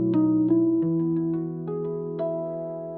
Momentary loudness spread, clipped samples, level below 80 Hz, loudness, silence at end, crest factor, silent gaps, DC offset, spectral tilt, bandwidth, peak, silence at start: 9 LU; under 0.1%; -66 dBFS; -25 LUFS; 0 s; 14 dB; none; under 0.1%; -13.5 dB/octave; 3.1 kHz; -12 dBFS; 0 s